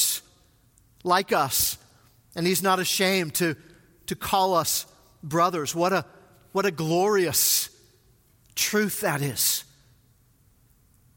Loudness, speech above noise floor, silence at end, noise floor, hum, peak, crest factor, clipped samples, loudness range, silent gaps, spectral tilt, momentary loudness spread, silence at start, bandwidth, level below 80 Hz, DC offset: -24 LUFS; 37 dB; 1.55 s; -61 dBFS; none; -8 dBFS; 20 dB; under 0.1%; 2 LU; none; -3 dB/octave; 13 LU; 0 s; 17 kHz; -60 dBFS; under 0.1%